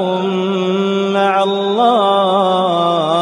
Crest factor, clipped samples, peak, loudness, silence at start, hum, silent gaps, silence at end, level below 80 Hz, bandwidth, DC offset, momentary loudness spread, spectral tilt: 12 dB; under 0.1%; -2 dBFS; -14 LUFS; 0 s; none; none; 0 s; -66 dBFS; 10 kHz; under 0.1%; 4 LU; -6 dB/octave